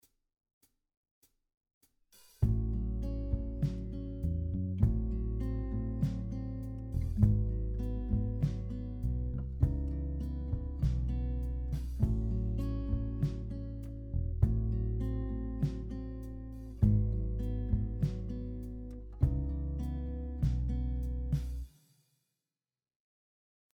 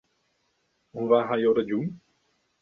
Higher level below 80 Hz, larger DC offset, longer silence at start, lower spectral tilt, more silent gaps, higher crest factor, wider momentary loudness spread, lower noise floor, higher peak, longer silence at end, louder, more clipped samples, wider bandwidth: first, -38 dBFS vs -70 dBFS; neither; first, 2.4 s vs 0.95 s; first, -10 dB/octave vs -8.5 dB/octave; neither; about the same, 20 dB vs 20 dB; second, 10 LU vs 13 LU; first, under -90 dBFS vs -72 dBFS; second, -14 dBFS vs -8 dBFS; first, 2.1 s vs 0.65 s; second, -35 LUFS vs -25 LUFS; neither; first, 6.2 kHz vs 4.2 kHz